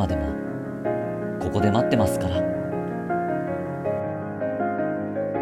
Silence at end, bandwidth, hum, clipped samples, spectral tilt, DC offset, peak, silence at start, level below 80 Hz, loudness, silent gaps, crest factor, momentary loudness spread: 0 s; 15.5 kHz; none; under 0.1%; -7 dB/octave; under 0.1%; -6 dBFS; 0 s; -44 dBFS; -26 LUFS; none; 20 dB; 8 LU